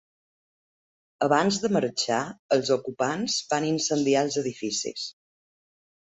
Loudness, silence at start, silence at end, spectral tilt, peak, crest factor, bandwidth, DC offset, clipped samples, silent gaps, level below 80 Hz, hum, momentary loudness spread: -26 LUFS; 1.2 s; 0.9 s; -3.5 dB/octave; -8 dBFS; 20 dB; 8.4 kHz; under 0.1%; under 0.1%; 2.39-2.49 s; -68 dBFS; none; 6 LU